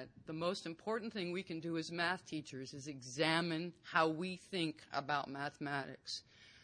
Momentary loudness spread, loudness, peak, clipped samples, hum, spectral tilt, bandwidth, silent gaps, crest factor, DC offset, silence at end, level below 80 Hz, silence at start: 12 LU; -40 LUFS; -16 dBFS; under 0.1%; none; -4.5 dB/octave; 10.5 kHz; none; 24 dB; under 0.1%; 0 s; -80 dBFS; 0 s